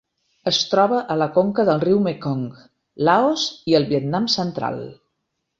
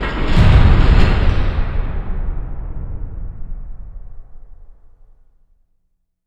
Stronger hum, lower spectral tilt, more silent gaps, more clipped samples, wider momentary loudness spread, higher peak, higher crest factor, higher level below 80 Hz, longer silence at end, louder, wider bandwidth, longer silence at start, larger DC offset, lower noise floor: neither; second, -5 dB/octave vs -7.5 dB/octave; neither; neither; second, 10 LU vs 23 LU; about the same, -2 dBFS vs 0 dBFS; about the same, 18 dB vs 16 dB; second, -60 dBFS vs -18 dBFS; second, 0.65 s vs 1.55 s; second, -20 LUFS vs -17 LUFS; about the same, 7.8 kHz vs 7.6 kHz; first, 0.45 s vs 0 s; neither; first, -76 dBFS vs -65 dBFS